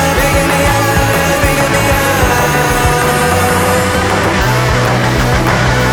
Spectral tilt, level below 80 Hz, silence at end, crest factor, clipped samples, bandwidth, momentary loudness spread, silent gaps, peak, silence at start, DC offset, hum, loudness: -4.5 dB/octave; -22 dBFS; 0 s; 10 dB; under 0.1%; over 20 kHz; 1 LU; none; 0 dBFS; 0 s; under 0.1%; none; -11 LUFS